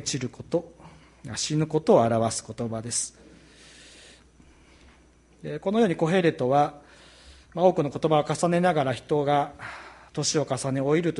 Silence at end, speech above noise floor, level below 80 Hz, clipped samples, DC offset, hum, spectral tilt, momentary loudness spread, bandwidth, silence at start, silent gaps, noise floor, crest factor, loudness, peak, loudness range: 0 s; 32 dB; -58 dBFS; under 0.1%; under 0.1%; none; -5 dB/octave; 14 LU; 11.5 kHz; 0 s; none; -57 dBFS; 20 dB; -25 LUFS; -6 dBFS; 7 LU